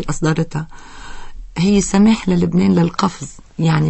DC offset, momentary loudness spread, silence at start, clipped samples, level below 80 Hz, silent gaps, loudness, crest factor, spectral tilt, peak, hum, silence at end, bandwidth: under 0.1%; 22 LU; 0 s; under 0.1%; -36 dBFS; none; -16 LUFS; 16 dB; -6 dB/octave; -2 dBFS; none; 0 s; 8.6 kHz